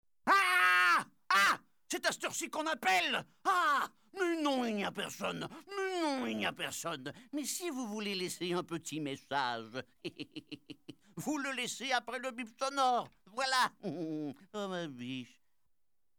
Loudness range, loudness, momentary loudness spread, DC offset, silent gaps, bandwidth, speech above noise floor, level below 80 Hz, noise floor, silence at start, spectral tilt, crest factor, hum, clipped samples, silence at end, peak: 8 LU; -34 LUFS; 15 LU; under 0.1%; none; over 20 kHz; 47 dB; -78 dBFS; -84 dBFS; 0.25 s; -2.5 dB/octave; 20 dB; none; under 0.1%; 0.95 s; -16 dBFS